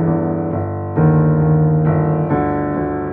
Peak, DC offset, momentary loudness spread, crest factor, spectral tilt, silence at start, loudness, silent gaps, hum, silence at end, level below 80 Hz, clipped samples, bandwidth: -4 dBFS; under 0.1%; 7 LU; 12 dB; -14 dB/octave; 0 s; -16 LUFS; none; none; 0 s; -38 dBFS; under 0.1%; 2.6 kHz